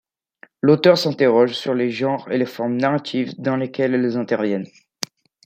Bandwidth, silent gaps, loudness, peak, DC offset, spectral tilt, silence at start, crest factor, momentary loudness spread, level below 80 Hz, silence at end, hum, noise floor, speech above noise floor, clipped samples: 16 kHz; none; -19 LUFS; 0 dBFS; under 0.1%; -6 dB/octave; 0.65 s; 20 dB; 13 LU; -66 dBFS; 0.4 s; none; -51 dBFS; 33 dB; under 0.1%